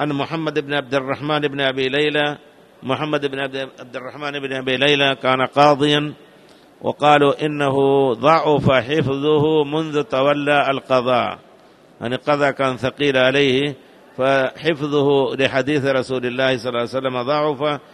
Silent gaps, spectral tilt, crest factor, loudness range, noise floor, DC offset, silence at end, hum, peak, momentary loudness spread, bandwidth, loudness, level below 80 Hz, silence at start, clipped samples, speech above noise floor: none; -6 dB/octave; 18 dB; 4 LU; -48 dBFS; under 0.1%; 0.15 s; none; 0 dBFS; 11 LU; 12 kHz; -18 LUFS; -54 dBFS; 0 s; under 0.1%; 30 dB